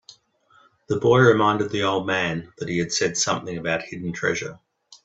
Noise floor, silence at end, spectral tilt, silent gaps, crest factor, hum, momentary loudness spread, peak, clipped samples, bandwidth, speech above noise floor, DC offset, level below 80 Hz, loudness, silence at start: -59 dBFS; 0.1 s; -4.5 dB/octave; none; 20 dB; none; 13 LU; -2 dBFS; under 0.1%; 8.4 kHz; 37 dB; under 0.1%; -58 dBFS; -22 LUFS; 0.1 s